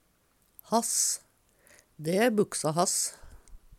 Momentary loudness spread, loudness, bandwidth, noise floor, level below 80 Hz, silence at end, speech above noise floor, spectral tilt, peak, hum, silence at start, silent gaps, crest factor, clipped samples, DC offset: 8 LU; -28 LUFS; 17 kHz; -68 dBFS; -60 dBFS; 0.05 s; 41 dB; -3 dB/octave; -10 dBFS; none; 0.7 s; none; 20 dB; under 0.1%; under 0.1%